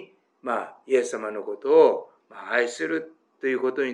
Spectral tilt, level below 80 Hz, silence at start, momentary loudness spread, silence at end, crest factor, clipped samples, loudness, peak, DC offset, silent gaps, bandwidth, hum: -3.5 dB/octave; under -90 dBFS; 0 s; 15 LU; 0 s; 20 dB; under 0.1%; -24 LUFS; -6 dBFS; under 0.1%; none; 10.5 kHz; none